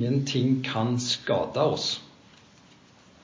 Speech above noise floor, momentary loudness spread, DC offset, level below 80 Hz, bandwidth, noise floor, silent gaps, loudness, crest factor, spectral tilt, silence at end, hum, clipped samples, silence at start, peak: 29 dB; 4 LU; under 0.1%; -62 dBFS; 7.6 kHz; -55 dBFS; none; -26 LUFS; 18 dB; -5 dB/octave; 1.15 s; none; under 0.1%; 0 s; -10 dBFS